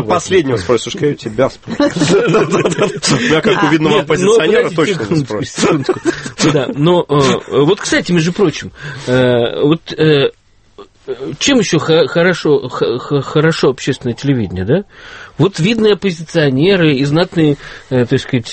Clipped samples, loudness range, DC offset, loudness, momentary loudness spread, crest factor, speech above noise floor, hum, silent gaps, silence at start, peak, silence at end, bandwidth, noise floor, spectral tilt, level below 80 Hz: under 0.1%; 3 LU; under 0.1%; -13 LUFS; 6 LU; 12 dB; 27 dB; none; none; 0 s; 0 dBFS; 0 s; 8.8 kHz; -40 dBFS; -5 dB/octave; -44 dBFS